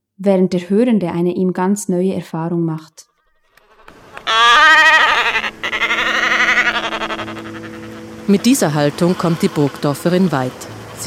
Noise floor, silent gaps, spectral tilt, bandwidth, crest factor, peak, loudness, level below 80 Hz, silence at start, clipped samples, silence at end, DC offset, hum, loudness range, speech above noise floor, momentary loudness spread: -56 dBFS; none; -4.5 dB/octave; 16 kHz; 14 dB; -2 dBFS; -14 LUFS; -50 dBFS; 0.2 s; under 0.1%; 0 s; under 0.1%; none; 7 LU; 40 dB; 18 LU